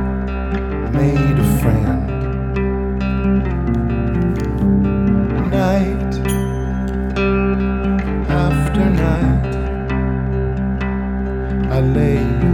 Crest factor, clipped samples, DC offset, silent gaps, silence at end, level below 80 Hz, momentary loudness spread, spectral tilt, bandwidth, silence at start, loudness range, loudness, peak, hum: 14 dB; under 0.1%; under 0.1%; none; 0 s; -22 dBFS; 6 LU; -8 dB/octave; 18.5 kHz; 0 s; 1 LU; -18 LUFS; -2 dBFS; none